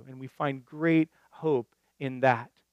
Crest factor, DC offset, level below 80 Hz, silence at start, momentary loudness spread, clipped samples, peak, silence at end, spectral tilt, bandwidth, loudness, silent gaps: 22 dB; under 0.1%; -82 dBFS; 0.05 s; 12 LU; under 0.1%; -8 dBFS; 0.25 s; -8.5 dB/octave; 7 kHz; -29 LUFS; none